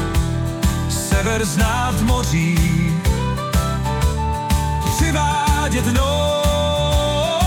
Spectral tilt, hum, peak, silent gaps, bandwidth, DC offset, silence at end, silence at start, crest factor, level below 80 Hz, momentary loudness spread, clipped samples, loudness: -5 dB/octave; none; -6 dBFS; none; 18 kHz; under 0.1%; 0 s; 0 s; 12 dB; -24 dBFS; 3 LU; under 0.1%; -18 LUFS